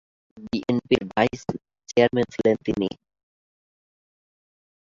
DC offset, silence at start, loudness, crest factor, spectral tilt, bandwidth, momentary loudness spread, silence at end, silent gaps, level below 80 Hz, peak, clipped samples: under 0.1%; 0.35 s; -24 LUFS; 22 dB; -6 dB/octave; 7.6 kHz; 12 LU; 2.1 s; none; -56 dBFS; -4 dBFS; under 0.1%